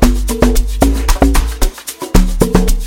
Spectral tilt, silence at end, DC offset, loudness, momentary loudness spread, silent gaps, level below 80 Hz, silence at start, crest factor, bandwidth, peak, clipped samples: -5.5 dB/octave; 0 s; under 0.1%; -14 LUFS; 7 LU; none; -12 dBFS; 0 s; 10 dB; 17 kHz; 0 dBFS; under 0.1%